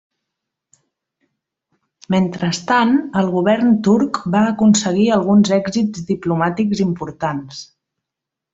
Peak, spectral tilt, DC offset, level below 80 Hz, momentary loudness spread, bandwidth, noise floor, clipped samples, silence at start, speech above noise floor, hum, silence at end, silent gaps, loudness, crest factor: -2 dBFS; -5.5 dB/octave; under 0.1%; -54 dBFS; 9 LU; 8 kHz; -83 dBFS; under 0.1%; 2.1 s; 67 dB; none; 0.9 s; none; -16 LUFS; 14 dB